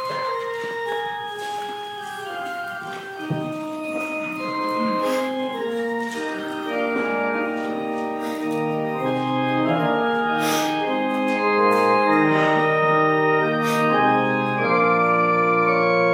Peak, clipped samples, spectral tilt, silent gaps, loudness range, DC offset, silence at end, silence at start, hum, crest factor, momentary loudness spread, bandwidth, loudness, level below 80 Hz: -6 dBFS; under 0.1%; -5.5 dB/octave; none; 10 LU; under 0.1%; 0 s; 0 s; none; 16 dB; 11 LU; 17 kHz; -22 LUFS; -74 dBFS